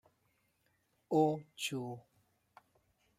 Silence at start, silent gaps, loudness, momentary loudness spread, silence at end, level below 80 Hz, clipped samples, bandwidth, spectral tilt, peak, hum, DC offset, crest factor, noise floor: 1.1 s; none; -36 LUFS; 14 LU; 1.2 s; -82 dBFS; under 0.1%; 16 kHz; -5.5 dB/octave; -18 dBFS; none; under 0.1%; 22 dB; -77 dBFS